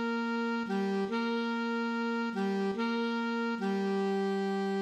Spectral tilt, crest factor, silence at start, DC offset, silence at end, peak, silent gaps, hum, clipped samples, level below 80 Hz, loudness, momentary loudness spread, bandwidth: -6.5 dB/octave; 10 dB; 0 s; under 0.1%; 0 s; -22 dBFS; none; none; under 0.1%; -80 dBFS; -32 LUFS; 1 LU; 9.4 kHz